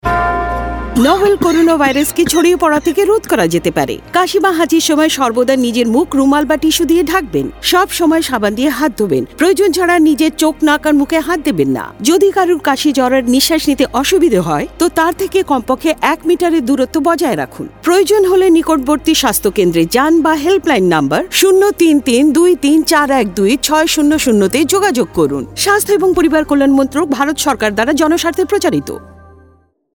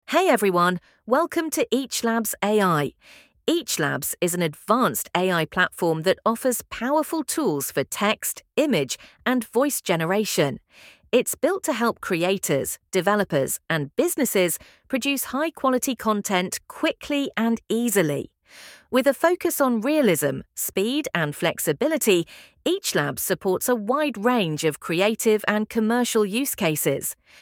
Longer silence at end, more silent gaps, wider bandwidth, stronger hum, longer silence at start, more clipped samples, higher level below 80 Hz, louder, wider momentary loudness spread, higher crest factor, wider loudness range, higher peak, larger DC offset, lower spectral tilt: first, 0.95 s vs 0.3 s; neither; about the same, over 20 kHz vs 19 kHz; neither; about the same, 0.05 s vs 0.1 s; neither; first, -36 dBFS vs -62 dBFS; first, -12 LUFS vs -23 LUFS; about the same, 5 LU vs 6 LU; second, 12 dB vs 20 dB; about the same, 2 LU vs 2 LU; about the same, 0 dBFS vs -2 dBFS; neither; about the same, -4 dB/octave vs -4 dB/octave